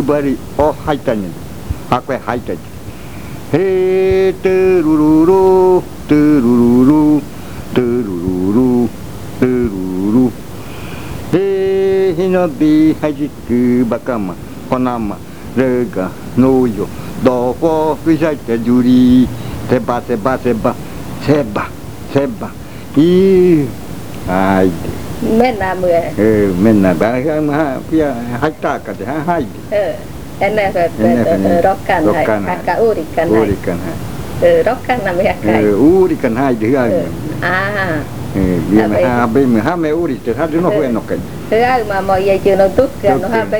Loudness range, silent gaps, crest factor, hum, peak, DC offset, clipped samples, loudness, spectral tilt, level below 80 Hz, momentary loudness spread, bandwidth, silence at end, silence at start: 5 LU; none; 14 dB; none; 0 dBFS; 3%; under 0.1%; -13 LUFS; -7.5 dB/octave; -36 dBFS; 13 LU; over 20 kHz; 0 s; 0 s